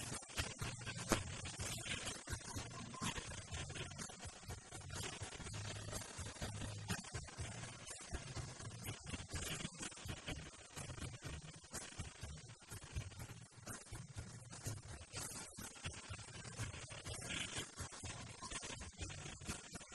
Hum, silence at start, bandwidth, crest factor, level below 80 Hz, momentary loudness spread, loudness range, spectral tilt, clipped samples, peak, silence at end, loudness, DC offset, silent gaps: none; 0 s; 12.5 kHz; 34 dB; -58 dBFS; 8 LU; 6 LU; -3 dB/octave; under 0.1%; -14 dBFS; 0 s; -48 LUFS; under 0.1%; none